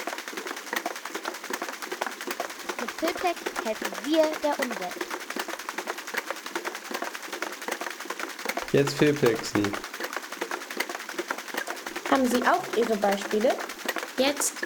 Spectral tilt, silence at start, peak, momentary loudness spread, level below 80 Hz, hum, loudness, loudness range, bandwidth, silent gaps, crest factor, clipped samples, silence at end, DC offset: -3.5 dB/octave; 0 s; -8 dBFS; 10 LU; -66 dBFS; none; -29 LUFS; 6 LU; over 20 kHz; none; 22 dB; under 0.1%; 0 s; under 0.1%